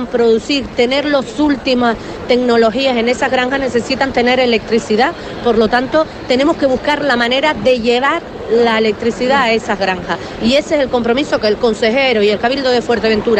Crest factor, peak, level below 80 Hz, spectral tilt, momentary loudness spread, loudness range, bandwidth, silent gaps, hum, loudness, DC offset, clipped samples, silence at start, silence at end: 12 dB; -2 dBFS; -40 dBFS; -4.5 dB/octave; 4 LU; 1 LU; 9 kHz; none; none; -14 LUFS; under 0.1%; under 0.1%; 0 s; 0 s